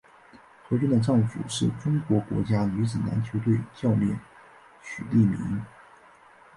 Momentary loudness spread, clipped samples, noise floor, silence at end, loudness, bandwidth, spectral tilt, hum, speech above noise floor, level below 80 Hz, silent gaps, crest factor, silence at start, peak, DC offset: 12 LU; under 0.1%; -53 dBFS; 0.9 s; -26 LUFS; 11.5 kHz; -7 dB/octave; none; 29 dB; -54 dBFS; none; 16 dB; 0.35 s; -10 dBFS; under 0.1%